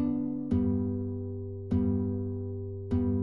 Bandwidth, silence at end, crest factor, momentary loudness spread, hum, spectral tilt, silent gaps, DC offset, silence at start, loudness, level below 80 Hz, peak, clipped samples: 4 kHz; 0 s; 14 dB; 9 LU; none; -12 dB/octave; none; 0.3%; 0 s; -32 LUFS; -48 dBFS; -16 dBFS; under 0.1%